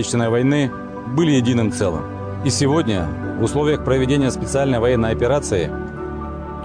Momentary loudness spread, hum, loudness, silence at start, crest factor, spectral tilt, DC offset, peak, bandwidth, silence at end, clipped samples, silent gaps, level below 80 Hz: 11 LU; none; -19 LUFS; 0 s; 12 dB; -6 dB/octave; under 0.1%; -6 dBFS; 10 kHz; 0 s; under 0.1%; none; -36 dBFS